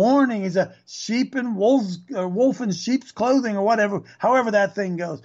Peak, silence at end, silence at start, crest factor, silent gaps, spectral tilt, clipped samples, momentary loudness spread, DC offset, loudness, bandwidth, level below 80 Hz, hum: -8 dBFS; 0.05 s; 0 s; 12 dB; none; -5.5 dB/octave; under 0.1%; 8 LU; under 0.1%; -22 LUFS; 7.8 kHz; -72 dBFS; none